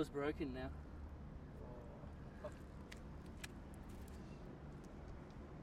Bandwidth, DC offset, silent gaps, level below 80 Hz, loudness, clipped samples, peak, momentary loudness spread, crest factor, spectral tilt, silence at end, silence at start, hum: 16 kHz; under 0.1%; none; -58 dBFS; -52 LUFS; under 0.1%; -28 dBFS; 10 LU; 22 dB; -6.5 dB/octave; 0 s; 0 s; none